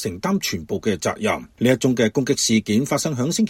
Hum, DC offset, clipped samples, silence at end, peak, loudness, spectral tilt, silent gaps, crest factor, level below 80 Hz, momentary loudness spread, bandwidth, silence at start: none; under 0.1%; under 0.1%; 0 s; -4 dBFS; -21 LUFS; -4.5 dB/octave; none; 18 dB; -52 dBFS; 6 LU; 16.5 kHz; 0 s